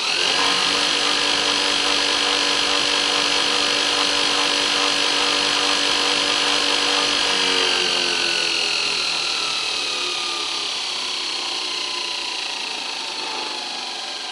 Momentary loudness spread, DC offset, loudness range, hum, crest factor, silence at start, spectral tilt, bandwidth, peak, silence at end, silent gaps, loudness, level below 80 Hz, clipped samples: 8 LU; under 0.1%; 6 LU; none; 16 dB; 0 s; 0 dB/octave; 12 kHz; -4 dBFS; 0 s; none; -18 LUFS; -56 dBFS; under 0.1%